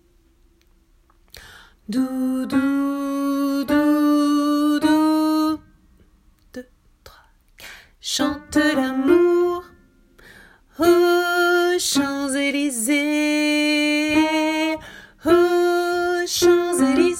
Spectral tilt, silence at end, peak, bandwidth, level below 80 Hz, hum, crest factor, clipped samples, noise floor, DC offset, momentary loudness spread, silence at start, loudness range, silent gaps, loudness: -3 dB/octave; 0 s; -4 dBFS; 16.5 kHz; -54 dBFS; none; 16 dB; under 0.1%; -57 dBFS; under 0.1%; 11 LU; 1.35 s; 6 LU; none; -19 LUFS